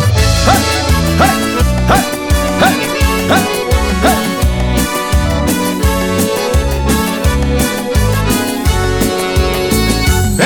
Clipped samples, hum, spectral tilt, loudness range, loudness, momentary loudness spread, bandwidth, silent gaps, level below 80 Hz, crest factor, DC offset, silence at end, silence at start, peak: under 0.1%; none; -4.5 dB/octave; 2 LU; -13 LUFS; 3 LU; 20 kHz; none; -18 dBFS; 12 dB; 0.2%; 0 s; 0 s; 0 dBFS